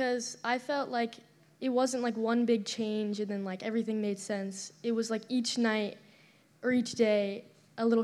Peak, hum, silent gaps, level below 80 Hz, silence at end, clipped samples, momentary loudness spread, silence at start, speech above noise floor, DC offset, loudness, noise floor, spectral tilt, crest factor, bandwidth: -14 dBFS; none; none; -84 dBFS; 0 s; under 0.1%; 9 LU; 0 s; 31 dB; under 0.1%; -32 LUFS; -62 dBFS; -4.5 dB/octave; 18 dB; 12.5 kHz